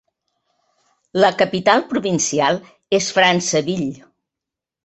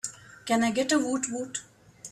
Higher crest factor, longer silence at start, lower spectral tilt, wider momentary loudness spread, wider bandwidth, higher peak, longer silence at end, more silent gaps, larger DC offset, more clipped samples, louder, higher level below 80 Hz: about the same, 18 dB vs 18 dB; first, 1.15 s vs 0.05 s; about the same, -3.5 dB/octave vs -3 dB/octave; second, 10 LU vs 15 LU; second, 8.4 kHz vs 14 kHz; first, -2 dBFS vs -12 dBFS; first, 0.9 s vs 0 s; neither; neither; neither; first, -18 LUFS vs -28 LUFS; first, -62 dBFS vs -68 dBFS